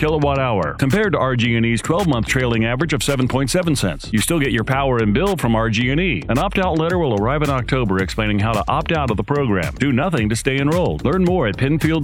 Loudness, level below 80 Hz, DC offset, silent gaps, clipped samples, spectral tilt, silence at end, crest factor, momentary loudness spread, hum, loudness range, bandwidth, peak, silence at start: -18 LUFS; -32 dBFS; under 0.1%; none; under 0.1%; -5.5 dB/octave; 0 s; 18 dB; 2 LU; none; 1 LU; 17.5 kHz; 0 dBFS; 0 s